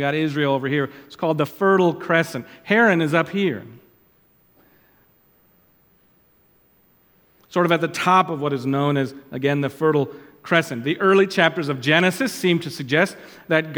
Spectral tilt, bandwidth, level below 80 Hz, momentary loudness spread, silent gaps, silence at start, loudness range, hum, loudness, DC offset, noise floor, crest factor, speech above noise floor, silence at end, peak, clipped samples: -5.5 dB/octave; 20 kHz; -68 dBFS; 9 LU; none; 0 s; 8 LU; none; -20 LUFS; under 0.1%; -59 dBFS; 20 dB; 39 dB; 0 s; 0 dBFS; under 0.1%